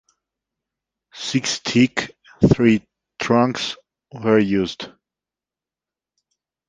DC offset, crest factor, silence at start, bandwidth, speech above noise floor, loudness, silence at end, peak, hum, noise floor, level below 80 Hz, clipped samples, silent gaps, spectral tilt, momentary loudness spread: under 0.1%; 20 dB; 1.15 s; 9.6 kHz; 71 dB; -19 LUFS; 1.8 s; -2 dBFS; none; -89 dBFS; -48 dBFS; under 0.1%; none; -5.5 dB/octave; 15 LU